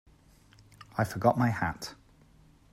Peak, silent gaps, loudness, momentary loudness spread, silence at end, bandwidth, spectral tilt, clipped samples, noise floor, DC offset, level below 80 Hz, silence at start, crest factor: -12 dBFS; none; -30 LUFS; 15 LU; 0.8 s; 15.5 kHz; -6.5 dB/octave; under 0.1%; -59 dBFS; under 0.1%; -58 dBFS; 0.95 s; 20 dB